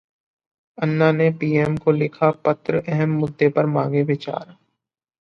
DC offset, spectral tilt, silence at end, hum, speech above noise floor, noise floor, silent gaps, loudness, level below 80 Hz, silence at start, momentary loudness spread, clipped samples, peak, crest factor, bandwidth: under 0.1%; -9 dB/octave; 0.8 s; none; 60 dB; -80 dBFS; none; -20 LUFS; -58 dBFS; 0.8 s; 6 LU; under 0.1%; -4 dBFS; 18 dB; 6.4 kHz